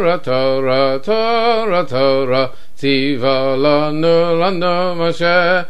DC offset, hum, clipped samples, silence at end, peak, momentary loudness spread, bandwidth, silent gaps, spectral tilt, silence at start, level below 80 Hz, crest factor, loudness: 8%; none; under 0.1%; 0.05 s; -2 dBFS; 4 LU; 10.5 kHz; none; -6.5 dB/octave; 0 s; -52 dBFS; 14 dB; -15 LUFS